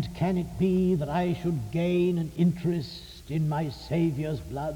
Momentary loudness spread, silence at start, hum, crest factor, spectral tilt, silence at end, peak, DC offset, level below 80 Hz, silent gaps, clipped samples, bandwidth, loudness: 8 LU; 0 s; none; 14 dB; -8 dB/octave; 0 s; -14 dBFS; under 0.1%; -48 dBFS; none; under 0.1%; 17 kHz; -28 LUFS